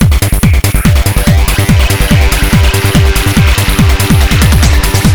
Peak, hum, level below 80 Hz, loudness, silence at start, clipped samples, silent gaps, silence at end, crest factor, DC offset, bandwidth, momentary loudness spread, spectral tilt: 0 dBFS; none; -10 dBFS; -8 LUFS; 0 s; 1%; none; 0 s; 8 dB; 3%; over 20 kHz; 2 LU; -5 dB/octave